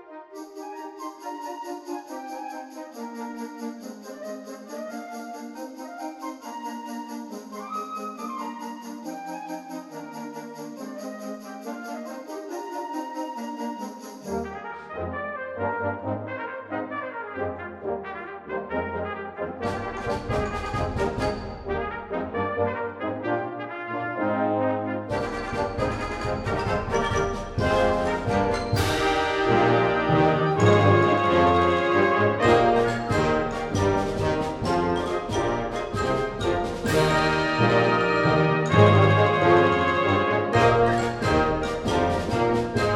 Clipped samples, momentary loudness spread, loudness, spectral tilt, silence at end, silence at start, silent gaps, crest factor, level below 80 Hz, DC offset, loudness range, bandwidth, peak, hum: under 0.1%; 17 LU; -24 LUFS; -6 dB/octave; 0 s; 0 s; none; 22 dB; -44 dBFS; under 0.1%; 16 LU; 15 kHz; -2 dBFS; none